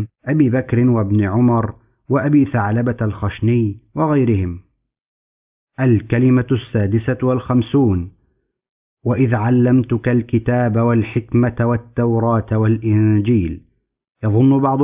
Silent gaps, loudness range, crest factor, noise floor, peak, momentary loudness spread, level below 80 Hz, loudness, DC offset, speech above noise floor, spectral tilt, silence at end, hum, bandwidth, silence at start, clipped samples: 5.01-5.67 s, 8.69-8.97 s; 2 LU; 14 dB; -65 dBFS; -2 dBFS; 7 LU; -38 dBFS; -17 LUFS; under 0.1%; 49 dB; -13 dB/octave; 0 s; none; 3.7 kHz; 0 s; under 0.1%